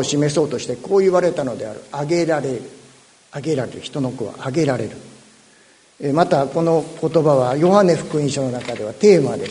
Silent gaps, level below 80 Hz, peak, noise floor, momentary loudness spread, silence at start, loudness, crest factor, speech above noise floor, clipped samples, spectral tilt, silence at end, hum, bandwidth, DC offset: none; -58 dBFS; 0 dBFS; -51 dBFS; 14 LU; 0 s; -19 LUFS; 18 dB; 33 dB; under 0.1%; -6 dB/octave; 0 s; none; 11 kHz; under 0.1%